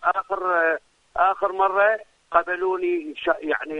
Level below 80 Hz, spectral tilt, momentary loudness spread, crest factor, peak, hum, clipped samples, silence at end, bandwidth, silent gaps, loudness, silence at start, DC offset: -60 dBFS; -5 dB/octave; 6 LU; 18 dB; -4 dBFS; none; under 0.1%; 0 s; 8.8 kHz; none; -23 LUFS; 0 s; under 0.1%